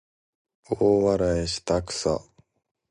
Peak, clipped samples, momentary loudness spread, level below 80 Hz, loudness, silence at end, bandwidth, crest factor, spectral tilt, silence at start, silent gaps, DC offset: -8 dBFS; under 0.1%; 8 LU; -44 dBFS; -24 LUFS; 0.7 s; 11.5 kHz; 16 dB; -5 dB/octave; 0.7 s; none; under 0.1%